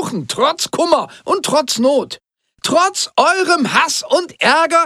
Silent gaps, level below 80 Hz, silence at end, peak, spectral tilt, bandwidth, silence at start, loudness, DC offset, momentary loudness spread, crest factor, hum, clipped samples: none; -62 dBFS; 0 s; 0 dBFS; -2.5 dB/octave; 15.5 kHz; 0 s; -15 LUFS; under 0.1%; 7 LU; 14 dB; none; under 0.1%